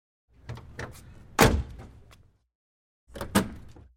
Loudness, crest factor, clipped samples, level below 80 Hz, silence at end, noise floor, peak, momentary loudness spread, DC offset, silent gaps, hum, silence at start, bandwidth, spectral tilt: -26 LUFS; 28 dB; under 0.1%; -40 dBFS; 0.3 s; -57 dBFS; -4 dBFS; 26 LU; under 0.1%; 2.55-3.07 s; none; 0.45 s; 16.5 kHz; -4.5 dB/octave